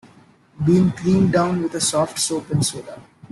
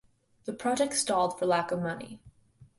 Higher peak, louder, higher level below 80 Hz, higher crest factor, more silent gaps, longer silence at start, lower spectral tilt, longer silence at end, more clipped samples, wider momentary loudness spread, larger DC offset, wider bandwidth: first, -6 dBFS vs -14 dBFS; first, -19 LUFS vs -29 LUFS; first, -52 dBFS vs -66 dBFS; about the same, 14 dB vs 18 dB; neither; first, 0.6 s vs 0.45 s; first, -5 dB/octave vs -3.5 dB/octave; first, 0.3 s vs 0.15 s; neither; second, 7 LU vs 15 LU; neither; about the same, 12.5 kHz vs 11.5 kHz